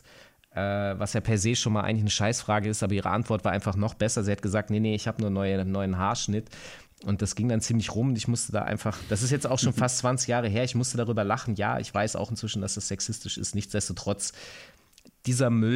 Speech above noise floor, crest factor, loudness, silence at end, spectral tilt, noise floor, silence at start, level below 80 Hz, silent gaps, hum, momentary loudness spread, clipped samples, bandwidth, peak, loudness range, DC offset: 31 dB; 16 dB; -28 LUFS; 0 s; -5 dB/octave; -58 dBFS; 0.55 s; -56 dBFS; none; none; 6 LU; under 0.1%; 14 kHz; -12 dBFS; 3 LU; under 0.1%